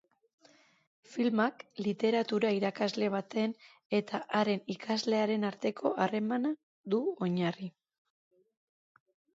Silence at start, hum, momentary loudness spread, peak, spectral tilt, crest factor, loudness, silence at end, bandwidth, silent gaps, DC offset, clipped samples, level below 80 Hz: 1.1 s; none; 7 LU; -14 dBFS; -6 dB/octave; 18 dB; -32 LUFS; 1.65 s; 7.8 kHz; 3.85-3.90 s, 6.63-6.84 s; under 0.1%; under 0.1%; -80 dBFS